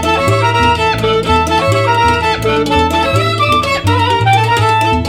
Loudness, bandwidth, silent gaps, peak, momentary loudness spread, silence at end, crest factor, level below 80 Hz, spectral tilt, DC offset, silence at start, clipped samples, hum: -11 LUFS; 16.5 kHz; none; 0 dBFS; 2 LU; 0 s; 12 dB; -28 dBFS; -5 dB/octave; under 0.1%; 0 s; under 0.1%; none